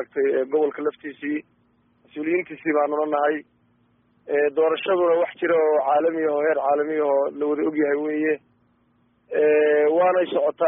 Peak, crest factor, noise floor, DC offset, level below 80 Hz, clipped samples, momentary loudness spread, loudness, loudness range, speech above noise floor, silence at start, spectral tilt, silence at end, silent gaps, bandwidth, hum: -8 dBFS; 14 dB; -64 dBFS; under 0.1%; -74 dBFS; under 0.1%; 10 LU; -22 LUFS; 5 LU; 42 dB; 0 s; 0.5 dB/octave; 0 s; none; 3.8 kHz; none